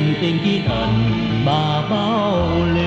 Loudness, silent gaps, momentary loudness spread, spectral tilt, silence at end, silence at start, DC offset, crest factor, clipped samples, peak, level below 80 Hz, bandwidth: -18 LUFS; none; 1 LU; -7.5 dB/octave; 0 s; 0 s; under 0.1%; 12 dB; under 0.1%; -6 dBFS; -36 dBFS; 8 kHz